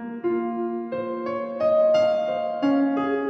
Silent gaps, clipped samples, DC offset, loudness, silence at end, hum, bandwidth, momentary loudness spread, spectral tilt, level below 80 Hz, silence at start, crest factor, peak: none; under 0.1%; under 0.1%; -23 LUFS; 0 s; none; 6.2 kHz; 10 LU; -6.5 dB/octave; -68 dBFS; 0 s; 12 dB; -12 dBFS